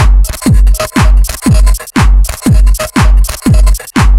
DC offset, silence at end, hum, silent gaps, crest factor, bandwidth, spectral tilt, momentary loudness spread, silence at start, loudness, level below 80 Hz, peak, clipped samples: 0.4%; 0 s; none; none; 6 dB; 16 kHz; -5.5 dB/octave; 2 LU; 0 s; -10 LUFS; -8 dBFS; 0 dBFS; 1%